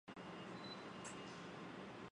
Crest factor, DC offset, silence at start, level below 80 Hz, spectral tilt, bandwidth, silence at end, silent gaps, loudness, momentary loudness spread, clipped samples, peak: 16 dB; under 0.1%; 0.05 s; -78 dBFS; -4 dB/octave; 10.5 kHz; 0 s; none; -52 LUFS; 2 LU; under 0.1%; -36 dBFS